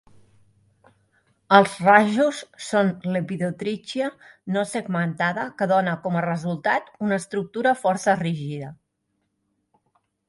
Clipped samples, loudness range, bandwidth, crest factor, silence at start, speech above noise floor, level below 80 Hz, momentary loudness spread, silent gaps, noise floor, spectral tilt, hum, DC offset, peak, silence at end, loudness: under 0.1%; 5 LU; 11.5 kHz; 24 dB; 1.5 s; 52 dB; -68 dBFS; 13 LU; none; -74 dBFS; -5.5 dB/octave; none; under 0.1%; 0 dBFS; 1.55 s; -22 LUFS